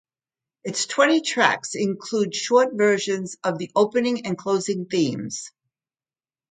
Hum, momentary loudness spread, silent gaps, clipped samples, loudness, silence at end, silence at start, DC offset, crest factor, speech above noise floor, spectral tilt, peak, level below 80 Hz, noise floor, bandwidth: none; 11 LU; none; under 0.1%; -22 LUFS; 1 s; 0.65 s; under 0.1%; 22 dB; over 68 dB; -4 dB/octave; 0 dBFS; -70 dBFS; under -90 dBFS; 9.6 kHz